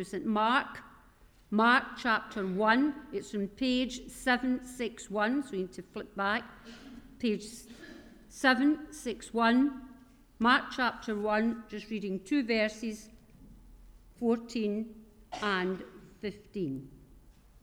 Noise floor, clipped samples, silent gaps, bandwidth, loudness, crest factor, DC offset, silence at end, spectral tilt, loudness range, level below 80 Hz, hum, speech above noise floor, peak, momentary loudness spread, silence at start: -60 dBFS; under 0.1%; none; 15.5 kHz; -31 LUFS; 20 dB; under 0.1%; 0.45 s; -4.5 dB/octave; 6 LU; -60 dBFS; none; 29 dB; -12 dBFS; 19 LU; 0 s